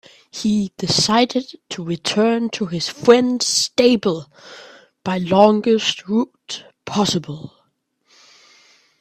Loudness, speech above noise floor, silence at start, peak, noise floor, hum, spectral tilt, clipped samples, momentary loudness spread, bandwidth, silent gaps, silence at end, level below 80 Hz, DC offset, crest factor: -18 LUFS; 48 dB; 0.35 s; 0 dBFS; -66 dBFS; none; -4 dB/octave; under 0.1%; 17 LU; 14.5 kHz; none; 1.55 s; -58 dBFS; under 0.1%; 20 dB